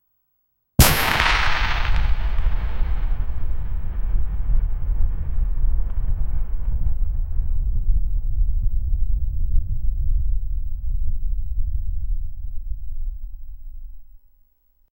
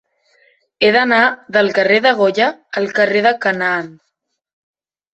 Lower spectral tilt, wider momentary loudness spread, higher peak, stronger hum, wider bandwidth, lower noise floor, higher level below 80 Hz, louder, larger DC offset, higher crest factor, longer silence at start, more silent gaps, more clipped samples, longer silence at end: second, -3.5 dB/octave vs -5 dB/octave; first, 17 LU vs 7 LU; about the same, 0 dBFS vs 0 dBFS; neither; first, 17 kHz vs 8.2 kHz; first, -70 dBFS vs -56 dBFS; first, -22 dBFS vs -62 dBFS; second, -25 LUFS vs -14 LUFS; neither; about the same, 18 dB vs 16 dB; about the same, 0.8 s vs 0.8 s; neither; neither; second, 0.8 s vs 1.25 s